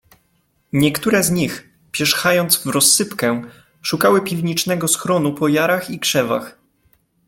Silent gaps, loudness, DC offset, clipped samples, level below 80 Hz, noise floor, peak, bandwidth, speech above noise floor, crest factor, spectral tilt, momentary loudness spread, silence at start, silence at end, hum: none; -17 LUFS; under 0.1%; under 0.1%; -54 dBFS; -63 dBFS; 0 dBFS; 17 kHz; 46 dB; 18 dB; -3.5 dB/octave; 11 LU; 0.75 s; 0.75 s; none